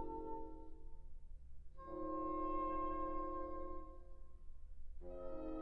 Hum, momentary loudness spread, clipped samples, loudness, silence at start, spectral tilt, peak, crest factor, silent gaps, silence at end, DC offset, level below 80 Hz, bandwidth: none; 21 LU; under 0.1%; -46 LUFS; 0 s; -8 dB/octave; -30 dBFS; 14 dB; none; 0 s; 0.1%; -52 dBFS; 3.4 kHz